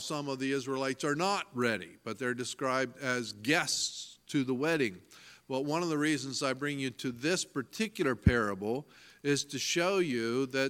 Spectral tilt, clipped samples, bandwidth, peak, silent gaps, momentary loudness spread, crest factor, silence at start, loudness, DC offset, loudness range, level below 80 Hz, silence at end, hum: -4 dB/octave; under 0.1%; 16.5 kHz; -10 dBFS; none; 8 LU; 22 dB; 0 s; -32 LUFS; under 0.1%; 2 LU; -52 dBFS; 0 s; none